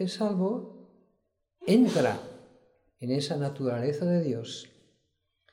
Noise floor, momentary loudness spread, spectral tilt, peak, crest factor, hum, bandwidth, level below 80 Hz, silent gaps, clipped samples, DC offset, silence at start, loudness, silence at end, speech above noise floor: -77 dBFS; 17 LU; -6.5 dB/octave; -10 dBFS; 20 dB; none; 15.5 kHz; -74 dBFS; none; under 0.1%; under 0.1%; 0 s; -28 LUFS; 0.85 s; 49 dB